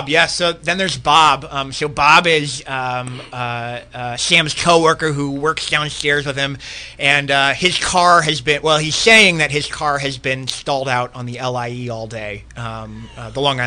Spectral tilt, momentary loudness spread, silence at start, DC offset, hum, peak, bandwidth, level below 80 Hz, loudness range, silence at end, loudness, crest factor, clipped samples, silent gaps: -3 dB/octave; 16 LU; 0 s; under 0.1%; none; 0 dBFS; 15.5 kHz; -44 dBFS; 8 LU; 0 s; -15 LUFS; 16 dB; under 0.1%; none